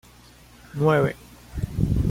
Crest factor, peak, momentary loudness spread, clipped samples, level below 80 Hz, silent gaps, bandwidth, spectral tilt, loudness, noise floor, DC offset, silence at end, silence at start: 18 dB; -8 dBFS; 18 LU; under 0.1%; -34 dBFS; none; 16.5 kHz; -8 dB/octave; -24 LUFS; -50 dBFS; under 0.1%; 0 s; 0.75 s